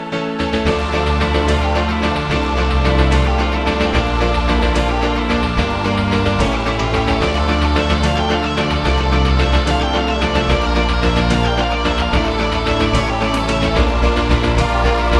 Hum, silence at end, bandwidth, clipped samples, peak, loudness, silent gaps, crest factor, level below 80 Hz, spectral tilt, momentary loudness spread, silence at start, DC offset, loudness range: none; 0 s; 10.5 kHz; under 0.1%; 0 dBFS; -16 LUFS; none; 14 dB; -20 dBFS; -6 dB/octave; 2 LU; 0 s; under 0.1%; 1 LU